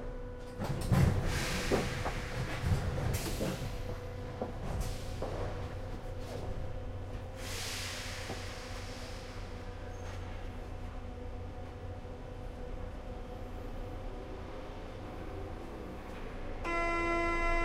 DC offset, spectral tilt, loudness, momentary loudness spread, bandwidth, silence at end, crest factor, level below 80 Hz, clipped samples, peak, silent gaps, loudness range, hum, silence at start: under 0.1%; -5 dB/octave; -38 LUFS; 13 LU; 16 kHz; 0 s; 22 dB; -42 dBFS; under 0.1%; -16 dBFS; none; 11 LU; none; 0 s